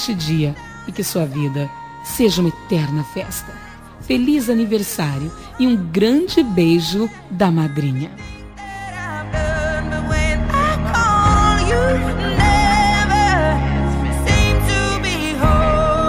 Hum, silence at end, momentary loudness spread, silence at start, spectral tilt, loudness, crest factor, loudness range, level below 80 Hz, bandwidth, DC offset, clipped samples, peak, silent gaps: none; 0 s; 14 LU; 0 s; -5.5 dB/octave; -17 LUFS; 16 dB; 6 LU; -26 dBFS; 17.5 kHz; under 0.1%; under 0.1%; 0 dBFS; none